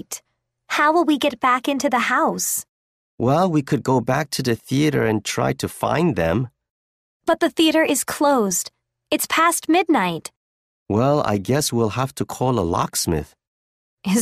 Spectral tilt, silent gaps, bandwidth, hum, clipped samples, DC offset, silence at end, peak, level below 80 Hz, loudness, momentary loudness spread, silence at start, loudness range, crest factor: -4.5 dB/octave; 2.69-3.18 s, 6.70-7.20 s, 10.36-10.86 s, 13.47-13.97 s; 15.5 kHz; none; under 0.1%; under 0.1%; 0 s; -4 dBFS; -48 dBFS; -20 LUFS; 8 LU; 0.1 s; 2 LU; 16 dB